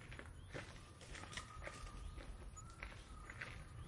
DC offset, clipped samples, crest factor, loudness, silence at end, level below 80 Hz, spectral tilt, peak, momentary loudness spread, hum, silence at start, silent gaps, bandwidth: under 0.1%; under 0.1%; 22 dB; -53 LUFS; 0 s; -58 dBFS; -4 dB/octave; -30 dBFS; 5 LU; none; 0 s; none; 11.5 kHz